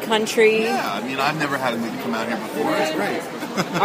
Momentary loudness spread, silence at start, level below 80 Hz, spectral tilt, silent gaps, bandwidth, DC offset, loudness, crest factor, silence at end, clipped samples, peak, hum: 9 LU; 0 s; -64 dBFS; -4 dB/octave; none; 15.5 kHz; under 0.1%; -21 LUFS; 20 dB; 0 s; under 0.1%; -2 dBFS; none